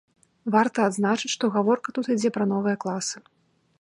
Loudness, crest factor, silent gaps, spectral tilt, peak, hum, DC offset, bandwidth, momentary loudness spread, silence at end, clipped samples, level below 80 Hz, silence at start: -24 LUFS; 18 dB; none; -4.5 dB/octave; -6 dBFS; none; under 0.1%; 11.5 kHz; 8 LU; 0.6 s; under 0.1%; -74 dBFS; 0.45 s